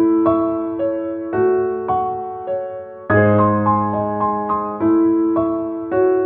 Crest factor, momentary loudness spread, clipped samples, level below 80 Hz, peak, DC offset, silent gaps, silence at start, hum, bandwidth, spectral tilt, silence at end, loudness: 16 dB; 10 LU; under 0.1%; -50 dBFS; -2 dBFS; under 0.1%; none; 0 s; none; 3.6 kHz; -12.5 dB/octave; 0 s; -18 LUFS